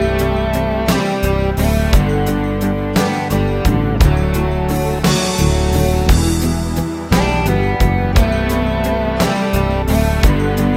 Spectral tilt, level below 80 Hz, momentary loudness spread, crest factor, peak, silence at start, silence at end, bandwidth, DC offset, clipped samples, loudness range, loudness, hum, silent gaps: -6 dB/octave; -20 dBFS; 3 LU; 14 dB; 0 dBFS; 0 s; 0 s; 16.5 kHz; under 0.1%; under 0.1%; 1 LU; -16 LUFS; none; none